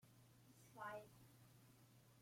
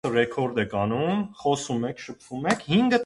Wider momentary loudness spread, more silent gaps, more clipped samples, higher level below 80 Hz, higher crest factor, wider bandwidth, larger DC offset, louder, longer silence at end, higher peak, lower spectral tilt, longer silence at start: first, 15 LU vs 9 LU; neither; neither; second, -86 dBFS vs -58 dBFS; about the same, 22 dB vs 18 dB; first, 16.5 kHz vs 11.5 kHz; neither; second, -60 LUFS vs -26 LUFS; about the same, 0 s vs 0 s; second, -40 dBFS vs -8 dBFS; about the same, -4.5 dB/octave vs -5.5 dB/octave; about the same, 0 s vs 0.05 s